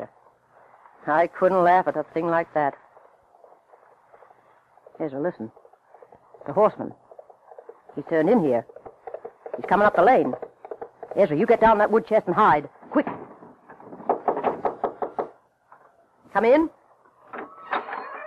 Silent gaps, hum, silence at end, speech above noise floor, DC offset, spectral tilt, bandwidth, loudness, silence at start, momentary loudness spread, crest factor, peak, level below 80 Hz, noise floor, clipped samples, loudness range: none; none; 0 s; 37 dB; under 0.1%; -8 dB/octave; 8.6 kHz; -22 LUFS; 0 s; 21 LU; 18 dB; -8 dBFS; -60 dBFS; -58 dBFS; under 0.1%; 10 LU